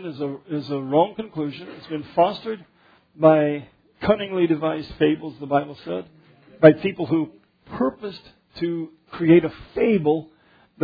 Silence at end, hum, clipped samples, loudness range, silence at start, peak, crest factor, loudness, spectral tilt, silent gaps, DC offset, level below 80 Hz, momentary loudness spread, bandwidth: 0 s; none; under 0.1%; 2 LU; 0 s; 0 dBFS; 22 dB; -22 LUFS; -9.5 dB/octave; none; under 0.1%; -56 dBFS; 16 LU; 5 kHz